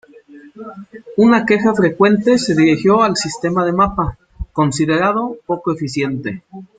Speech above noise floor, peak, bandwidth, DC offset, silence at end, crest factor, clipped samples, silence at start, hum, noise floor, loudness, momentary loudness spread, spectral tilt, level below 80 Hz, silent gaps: 26 dB; 0 dBFS; 9.4 kHz; under 0.1%; 0.15 s; 16 dB; under 0.1%; 0.3 s; none; -41 dBFS; -15 LUFS; 19 LU; -5.5 dB/octave; -40 dBFS; none